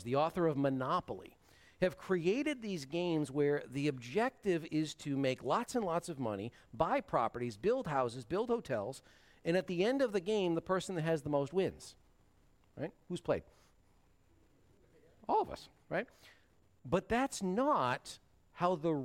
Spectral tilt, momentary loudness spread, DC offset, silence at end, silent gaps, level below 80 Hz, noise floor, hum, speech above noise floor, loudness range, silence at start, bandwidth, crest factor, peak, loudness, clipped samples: -6 dB/octave; 11 LU; under 0.1%; 0 s; none; -66 dBFS; -70 dBFS; none; 35 dB; 7 LU; 0 s; 16 kHz; 18 dB; -18 dBFS; -36 LUFS; under 0.1%